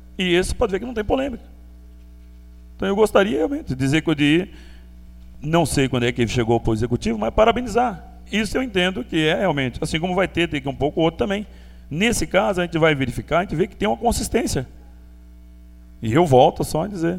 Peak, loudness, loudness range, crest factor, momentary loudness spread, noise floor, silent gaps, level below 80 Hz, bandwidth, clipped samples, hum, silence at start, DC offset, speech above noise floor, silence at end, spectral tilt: -2 dBFS; -20 LUFS; 2 LU; 20 dB; 8 LU; -43 dBFS; none; -36 dBFS; 16 kHz; under 0.1%; 60 Hz at -40 dBFS; 0.05 s; under 0.1%; 23 dB; 0 s; -5.5 dB/octave